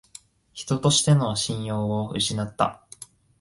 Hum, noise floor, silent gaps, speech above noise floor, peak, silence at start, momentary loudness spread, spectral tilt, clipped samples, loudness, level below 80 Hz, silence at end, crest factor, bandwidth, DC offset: none; -50 dBFS; none; 27 dB; -4 dBFS; 0.55 s; 23 LU; -4.5 dB/octave; under 0.1%; -23 LUFS; -54 dBFS; 0.35 s; 20 dB; 11.5 kHz; under 0.1%